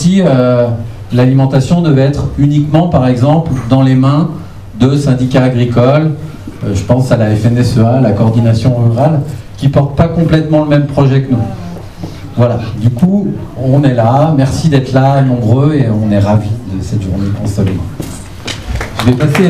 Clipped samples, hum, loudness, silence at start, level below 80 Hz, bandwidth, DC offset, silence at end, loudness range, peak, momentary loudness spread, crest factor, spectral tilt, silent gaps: 0.5%; none; -11 LUFS; 0 s; -30 dBFS; 13 kHz; 1%; 0 s; 3 LU; 0 dBFS; 11 LU; 10 dB; -8 dB/octave; none